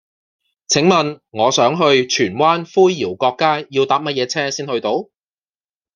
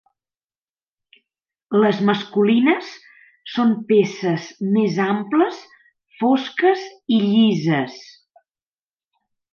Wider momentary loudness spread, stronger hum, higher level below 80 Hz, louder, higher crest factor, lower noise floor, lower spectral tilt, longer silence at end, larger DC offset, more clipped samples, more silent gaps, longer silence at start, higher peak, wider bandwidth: about the same, 7 LU vs 9 LU; neither; first, -62 dBFS vs -70 dBFS; first, -16 LUFS vs -19 LUFS; about the same, 16 dB vs 16 dB; about the same, under -90 dBFS vs under -90 dBFS; second, -4 dB/octave vs -6.5 dB/octave; second, 0.9 s vs 1.5 s; neither; neither; neither; second, 0.7 s vs 1.7 s; first, 0 dBFS vs -4 dBFS; first, 10 kHz vs 6.8 kHz